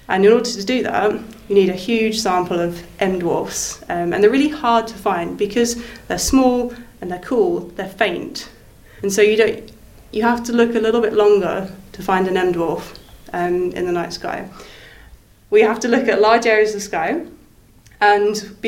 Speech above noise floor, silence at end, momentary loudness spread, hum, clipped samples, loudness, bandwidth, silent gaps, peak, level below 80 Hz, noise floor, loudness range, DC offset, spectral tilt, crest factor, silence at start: 31 dB; 0 s; 14 LU; none; under 0.1%; -18 LUFS; 16.5 kHz; none; 0 dBFS; -44 dBFS; -48 dBFS; 4 LU; under 0.1%; -4 dB/octave; 18 dB; 0.1 s